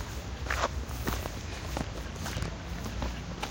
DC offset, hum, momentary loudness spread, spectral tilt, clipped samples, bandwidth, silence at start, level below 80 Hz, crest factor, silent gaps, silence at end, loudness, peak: under 0.1%; none; 7 LU; -4.5 dB/octave; under 0.1%; 17 kHz; 0 s; -40 dBFS; 22 dB; none; 0 s; -36 LUFS; -12 dBFS